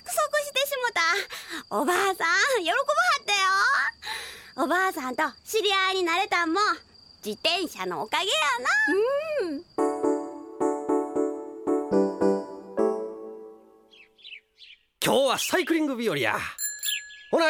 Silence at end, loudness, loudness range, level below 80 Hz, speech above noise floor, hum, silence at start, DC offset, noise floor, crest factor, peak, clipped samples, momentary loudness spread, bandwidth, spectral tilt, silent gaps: 0 s; -25 LUFS; 5 LU; -66 dBFS; 30 dB; none; 0.05 s; under 0.1%; -55 dBFS; 20 dB; -6 dBFS; under 0.1%; 12 LU; 17.5 kHz; -2.5 dB/octave; none